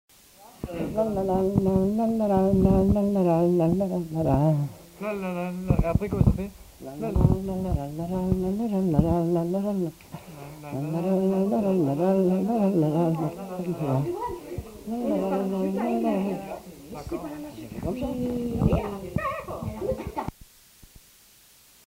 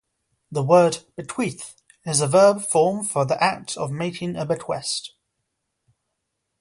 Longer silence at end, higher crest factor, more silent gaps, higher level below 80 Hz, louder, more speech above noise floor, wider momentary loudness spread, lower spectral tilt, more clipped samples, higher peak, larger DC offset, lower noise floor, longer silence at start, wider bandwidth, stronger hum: about the same, 1.55 s vs 1.55 s; about the same, 20 dB vs 20 dB; neither; first, -38 dBFS vs -64 dBFS; second, -26 LUFS vs -21 LUFS; second, 31 dB vs 57 dB; about the same, 14 LU vs 15 LU; first, -9 dB/octave vs -4.5 dB/octave; neither; about the same, -6 dBFS vs -4 dBFS; neither; second, -55 dBFS vs -78 dBFS; about the same, 0.4 s vs 0.5 s; first, 16 kHz vs 11.5 kHz; neither